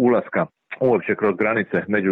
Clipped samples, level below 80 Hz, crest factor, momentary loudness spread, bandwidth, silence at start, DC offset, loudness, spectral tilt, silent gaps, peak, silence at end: under 0.1%; -64 dBFS; 12 dB; 6 LU; 4.2 kHz; 0 s; under 0.1%; -21 LUFS; -10 dB/octave; none; -8 dBFS; 0 s